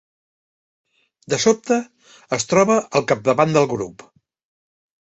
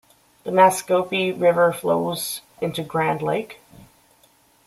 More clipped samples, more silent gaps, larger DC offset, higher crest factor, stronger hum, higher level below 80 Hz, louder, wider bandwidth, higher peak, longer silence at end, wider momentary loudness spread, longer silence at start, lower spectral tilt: neither; neither; neither; about the same, 20 dB vs 20 dB; neither; first, -58 dBFS vs -64 dBFS; about the same, -19 LUFS vs -21 LUFS; second, 8.2 kHz vs 15.5 kHz; about the same, -2 dBFS vs -2 dBFS; about the same, 1.1 s vs 1.15 s; about the same, 11 LU vs 12 LU; first, 1.3 s vs 0.45 s; about the same, -4.5 dB/octave vs -4.5 dB/octave